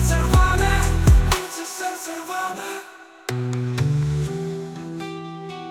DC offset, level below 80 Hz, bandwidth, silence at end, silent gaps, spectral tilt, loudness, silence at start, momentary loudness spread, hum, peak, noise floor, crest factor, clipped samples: under 0.1%; -24 dBFS; 18 kHz; 0 s; none; -5 dB/octave; -22 LUFS; 0 s; 16 LU; none; -4 dBFS; -41 dBFS; 16 dB; under 0.1%